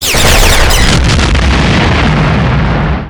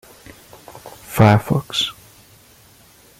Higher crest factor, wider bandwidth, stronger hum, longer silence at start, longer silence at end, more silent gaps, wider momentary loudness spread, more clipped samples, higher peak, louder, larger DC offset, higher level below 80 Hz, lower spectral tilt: second, 8 dB vs 20 dB; first, over 20 kHz vs 16 kHz; neither; second, 0 s vs 0.75 s; second, 0 s vs 1.3 s; neither; second, 4 LU vs 26 LU; first, 1% vs under 0.1%; about the same, 0 dBFS vs -2 dBFS; first, -8 LUFS vs -17 LUFS; neither; first, -12 dBFS vs -48 dBFS; second, -4 dB/octave vs -5.5 dB/octave